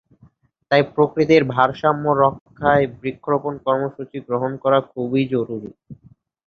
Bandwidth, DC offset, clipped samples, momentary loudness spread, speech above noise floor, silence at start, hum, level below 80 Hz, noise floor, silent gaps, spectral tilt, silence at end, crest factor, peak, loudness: 6.8 kHz; under 0.1%; under 0.1%; 11 LU; 35 dB; 0.7 s; none; -54 dBFS; -54 dBFS; 2.41-2.46 s; -7.5 dB/octave; 0.55 s; 18 dB; -2 dBFS; -19 LUFS